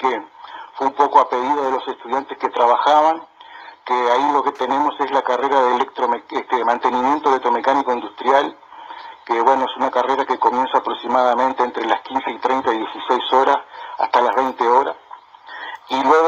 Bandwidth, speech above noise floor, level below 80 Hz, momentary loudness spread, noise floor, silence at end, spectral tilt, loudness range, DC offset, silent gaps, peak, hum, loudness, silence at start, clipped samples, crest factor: 7.6 kHz; 22 dB; -66 dBFS; 15 LU; -40 dBFS; 0 s; -3.5 dB/octave; 1 LU; under 0.1%; none; 0 dBFS; none; -18 LUFS; 0 s; under 0.1%; 18 dB